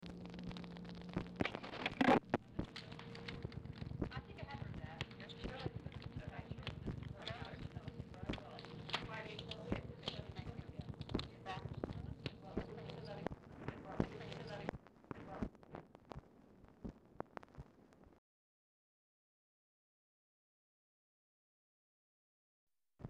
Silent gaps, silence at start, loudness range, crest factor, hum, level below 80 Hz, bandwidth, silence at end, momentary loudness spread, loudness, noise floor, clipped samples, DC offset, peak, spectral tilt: 18.18-22.67 s; 0 s; 16 LU; 26 dB; none; -60 dBFS; 11.5 kHz; 0 s; 12 LU; -46 LUFS; -65 dBFS; under 0.1%; under 0.1%; -22 dBFS; -6.5 dB/octave